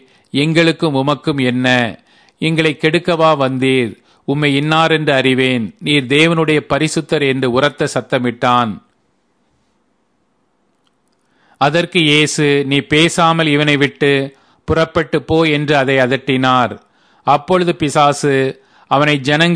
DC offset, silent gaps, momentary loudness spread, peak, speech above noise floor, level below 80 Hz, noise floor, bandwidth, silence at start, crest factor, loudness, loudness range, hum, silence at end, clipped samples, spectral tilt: under 0.1%; none; 7 LU; 0 dBFS; 49 dB; -48 dBFS; -62 dBFS; 11 kHz; 0.35 s; 14 dB; -14 LUFS; 6 LU; none; 0 s; under 0.1%; -5 dB/octave